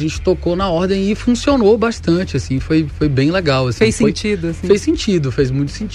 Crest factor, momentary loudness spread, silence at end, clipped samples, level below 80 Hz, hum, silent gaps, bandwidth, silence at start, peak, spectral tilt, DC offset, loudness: 14 dB; 5 LU; 0 s; under 0.1%; -32 dBFS; none; none; 12 kHz; 0 s; -2 dBFS; -6 dB/octave; under 0.1%; -16 LUFS